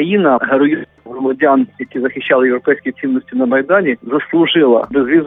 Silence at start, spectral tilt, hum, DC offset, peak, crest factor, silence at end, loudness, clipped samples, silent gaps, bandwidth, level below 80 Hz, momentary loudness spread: 0 s; -9.5 dB/octave; none; under 0.1%; -2 dBFS; 12 dB; 0 s; -14 LUFS; under 0.1%; none; 3.9 kHz; -56 dBFS; 8 LU